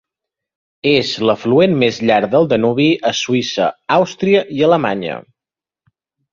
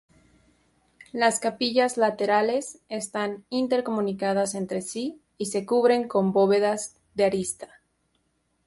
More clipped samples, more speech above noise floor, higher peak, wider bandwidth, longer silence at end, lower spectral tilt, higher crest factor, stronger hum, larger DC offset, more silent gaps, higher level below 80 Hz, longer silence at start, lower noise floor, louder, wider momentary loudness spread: neither; first, 74 dB vs 47 dB; first, 0 dBFS vs -8 dBFS; second, 7.6 kHz vs 12 kHz; about the same, 1.1 s vs 1 s; first, -5.5 dB/octave vs -4 dB/octave; about the same, 16 dB vs 18 dB; neither; neither; neither; first, -56 dBFS vs -66 dBFS; second, 0.85 s vs 1.15 s; first, -88 dBFS vs -72 dBFS; first, -15 LUFS vs -25 LUFS; second, 6 LU vs 12 LU